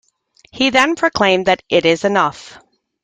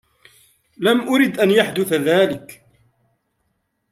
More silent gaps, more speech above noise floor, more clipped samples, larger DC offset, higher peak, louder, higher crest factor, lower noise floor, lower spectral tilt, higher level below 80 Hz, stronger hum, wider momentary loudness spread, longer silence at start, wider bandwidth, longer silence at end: neither; second, 39 dB vs 54 dB; neither; neither; about the same, 0 dBFS vs -2 dBFS; about the same, -15 LUFS vs -17 LUFS; about the same, 16 dB vs 18 dB; second, -54 dBFS vs -71 dBFS; about the same, -4 dB/octave vs -5 dB/octave; first, -52 dBFS vs -64 dBFS; neither; about the same, 5 LU vs 5 LU; second, 0.55 s vs 0.8 s; second, 10.5 kHz vs 16 kHz; second, 0.55 s vs 1.35 s